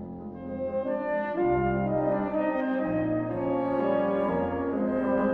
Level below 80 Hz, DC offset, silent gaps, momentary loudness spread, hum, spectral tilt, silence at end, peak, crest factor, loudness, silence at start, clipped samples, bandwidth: -50 dBFS; under 0.1%; none; 5 LU; none; -10.5 dB/octave; 0 s; -14 dBFS; 12 dB; -28 LUFS; 0 s; under 0.1%; 4.7 kHz